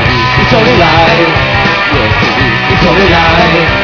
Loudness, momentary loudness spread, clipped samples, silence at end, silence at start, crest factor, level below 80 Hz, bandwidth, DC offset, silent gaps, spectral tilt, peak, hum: -7 LUFS; 3 LU; 2%; 0 s; 0 s; 8 dB; -22 dBFS; 5.4 kHz; 0.5%; none; -6 dB/octave; 0 dBFS; none